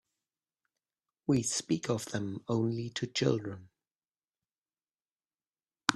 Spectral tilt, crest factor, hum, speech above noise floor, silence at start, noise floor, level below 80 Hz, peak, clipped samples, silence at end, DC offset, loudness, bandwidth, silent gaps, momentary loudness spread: -4.5 dB/octave; 32 dB; none; over 58 dB; 1.3 s; under -90 dBFS; -70 dBFS; -4 dBFS; under 0.1%; 0 s; under 0.1%; -33 LUFS; 13 kHz; 4.58-4.62 s, 5.12-5.16 s; 8 LU